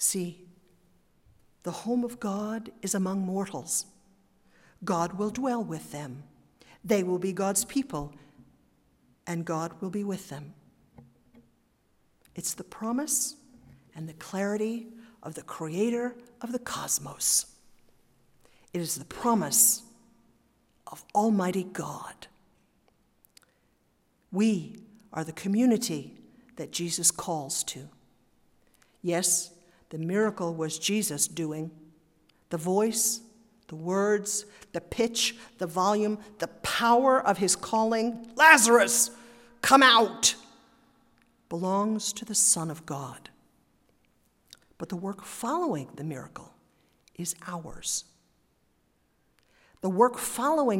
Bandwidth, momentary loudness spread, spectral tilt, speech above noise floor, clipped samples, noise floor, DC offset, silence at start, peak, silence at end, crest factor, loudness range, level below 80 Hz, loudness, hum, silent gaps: 16 kHz; 19 LU; -3 dB/octave; 42 dB; under 0.1%; -70 dBFS; under 0.1%; 0 s; -2 dBFS; 0 s; 28 dB; 14 LU; -64 dBFS; -27 LUFS; none; none